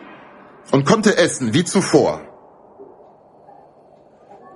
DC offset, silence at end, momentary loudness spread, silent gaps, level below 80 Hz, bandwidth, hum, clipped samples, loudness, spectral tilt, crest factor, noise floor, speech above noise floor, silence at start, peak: under 0.1%; 1.7 s; 6 LU; none; -56 dBFS; 11.5 kHz; none; under 0.1%; -16 LUFS; -5 dB/octave; 20 dB; -49 dBFS; 33 dB; 0 s; 0 dBFS